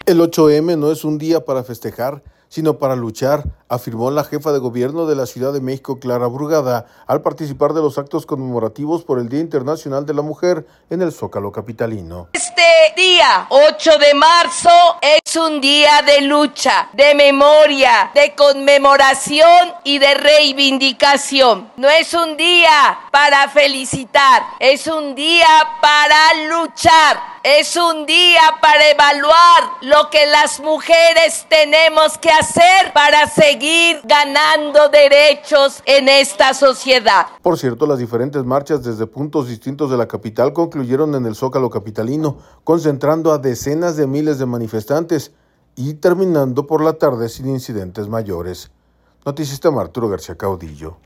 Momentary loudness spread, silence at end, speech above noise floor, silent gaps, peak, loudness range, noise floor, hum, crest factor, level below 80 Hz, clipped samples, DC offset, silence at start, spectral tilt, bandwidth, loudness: 14 LU; 0.1 s; 43 dB; none; 0 dBFS; 10 LU; -56 dBFS; none; 12 dB; -48 dBFS; under 0.1%; under 0.1%; 0.05 s; -3.5 dB/octave; 15.5 kHz; -12 LUFS